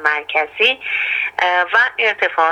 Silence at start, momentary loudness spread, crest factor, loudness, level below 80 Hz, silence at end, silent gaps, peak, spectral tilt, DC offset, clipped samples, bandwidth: 0 s; 4 LU; 16 dB; -15 LUFS; -66 dBFS; 0 s; none; 0 dBFS; -1 dB/octave; under 0.1%; under 0.1%; 14 kHz